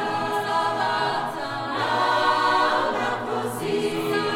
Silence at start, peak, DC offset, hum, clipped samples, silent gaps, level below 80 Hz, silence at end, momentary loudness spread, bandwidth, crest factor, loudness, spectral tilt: 0 s; -8 dBFS; under 0.1%; none; under 0.1%; none; -60 dBFS; 0 s; 7 LU; 17.5 kHz; 16 dB; -23 LUFS; -4 dB/octave